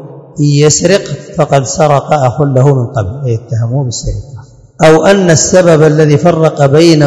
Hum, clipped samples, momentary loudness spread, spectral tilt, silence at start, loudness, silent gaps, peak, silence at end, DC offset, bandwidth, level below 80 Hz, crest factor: none; 5%; 10 LU; -5.5 dB/octave; 0 s; -8 LUFS; none; 0 dBFS; 0 s; under 0.1%; 12 kHz; -34 dBFS; 8 dB